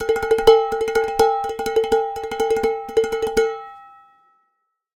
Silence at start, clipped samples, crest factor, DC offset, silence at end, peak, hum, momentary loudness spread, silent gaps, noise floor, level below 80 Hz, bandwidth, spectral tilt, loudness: 0 s; under 0.1%; 20 dB; under 0.1%; 1.1 s; 0 dBFS; none; 9 LU; none; -72 dBFS; -46 dBFS; 18 kHz; -3.5 dB/octave; -19 LUFS